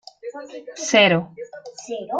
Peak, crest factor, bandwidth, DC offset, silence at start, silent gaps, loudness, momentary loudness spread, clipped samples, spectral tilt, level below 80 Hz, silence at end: -2 dBFS; 20 dB; 9.4 kHz; under 0.1%; 0.25 s; none; -17 LUFS; 22 LU; under 0.1%; -3.5 dB/octave; -68 dBFS; 0 s